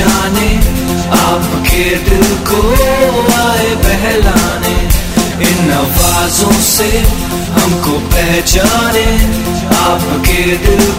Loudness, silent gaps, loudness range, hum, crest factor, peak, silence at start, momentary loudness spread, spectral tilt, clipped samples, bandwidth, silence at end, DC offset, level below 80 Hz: -10 LUFS; none; 1 LU; none; 10 dB; 0 dBFS; 0 s; 4 LU; -4 dB/octave; 0.6%; 17 kHz; 0 s; under 0.1%; -16 dBFS